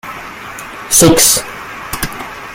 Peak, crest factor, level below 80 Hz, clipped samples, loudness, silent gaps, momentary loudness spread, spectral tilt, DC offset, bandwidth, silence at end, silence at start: 0 dBFS; 14 dB; -36 dBFS; 0.1%; -10 LUFS; none; 20 LU; -2.5 dB/octave; under 0.1%; over 20 kHz; 0 s; 0.05 s